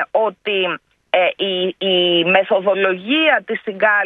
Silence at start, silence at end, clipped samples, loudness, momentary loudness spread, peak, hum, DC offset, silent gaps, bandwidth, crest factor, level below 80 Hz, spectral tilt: 0 s; 0 s; under 0.1%; -16 LUFS; 6 LU; 0 dBFS; none; under 0.1%; none; 4.3 kHz; 16 dB; -70 dBFS; -7 dB/octave